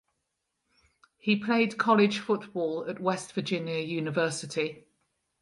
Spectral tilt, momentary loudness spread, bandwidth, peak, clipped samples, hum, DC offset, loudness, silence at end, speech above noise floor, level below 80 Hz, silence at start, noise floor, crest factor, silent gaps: -5 dB/octave; 9 LU; 11.5 kHz; -10 dBFS; under 0.1%; none; under 0.1%; -28 LUFS; 0.65 s; 53 dB; -76 dBFS; 1.25 s; -81 dBFS; 20 dB; none